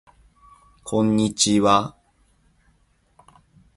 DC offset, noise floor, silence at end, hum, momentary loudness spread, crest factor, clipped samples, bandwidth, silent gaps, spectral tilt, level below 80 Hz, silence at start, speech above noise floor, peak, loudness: under 0.1%; -62 dBFS; 1.85 s; none; 15 LU; 22 dB; under 0.1%; 11.5 kHz; none; -4 dB/octave; -54 dBFS; 0.85 s; 44 dB; -2 dBFS; -19 LUFS